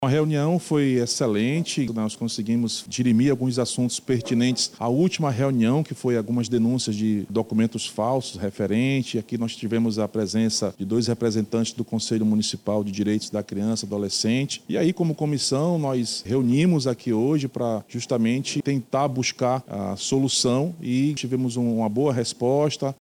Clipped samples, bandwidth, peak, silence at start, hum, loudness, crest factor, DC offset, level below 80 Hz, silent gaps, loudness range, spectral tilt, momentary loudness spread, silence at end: under 0.1%; 15.5 kHz; -12 dBFS; 0 s; none; -23 LUFS; 12 dB; under 0.1%; -62 dBFS; none; 2 LU; -5.5 dB/octave; 5 LU; 0.1 s